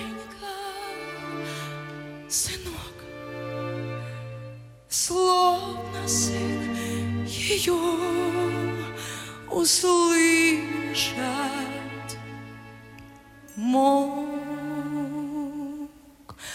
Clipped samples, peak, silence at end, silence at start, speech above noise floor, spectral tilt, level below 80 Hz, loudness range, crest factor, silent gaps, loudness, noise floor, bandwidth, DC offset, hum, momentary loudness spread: under 0.1%; -10 dBFS; 0 s; 0 s; 25 dB; -3.5 dB/octave; -56 dBFS; 9 LU; 18 dB; none; -25 LUFS; -48 dBFS; 16.5 kHz; under 0.1%; none; 19 LU